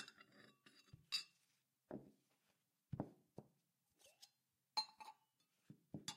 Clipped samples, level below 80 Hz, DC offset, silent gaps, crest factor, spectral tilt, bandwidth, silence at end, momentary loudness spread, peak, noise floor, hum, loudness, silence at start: under 0.1%; -82 dBFS; under 0.1%; none; 26 dB; -3 dB/octave; 15.5 kHz; 0 s; 22 LU; -30 dBFS; -86 dBFS; none; -50 LUFS; 0 s